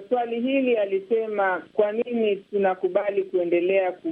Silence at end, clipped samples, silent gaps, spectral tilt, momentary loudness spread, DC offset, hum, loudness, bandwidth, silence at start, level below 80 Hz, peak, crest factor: 0 s; under 0.1%; none; -8 dB/octave; 3 LU; under 0.1%; none; -24 LUFS; 4.2 kHz; 0 s; -76 dBFS; -8 dBFS; 16 dB